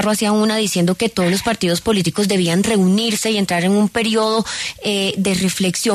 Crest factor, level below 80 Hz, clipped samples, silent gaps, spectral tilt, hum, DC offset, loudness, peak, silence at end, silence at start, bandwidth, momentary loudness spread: 12 dB; -48 dBFS; under 0.1%; none; -4.5 dB/octave; none; under 0.1%; -17 LUFS; -4 dBFS; 0 s; 0 s; 13.5 kHz; 3 LU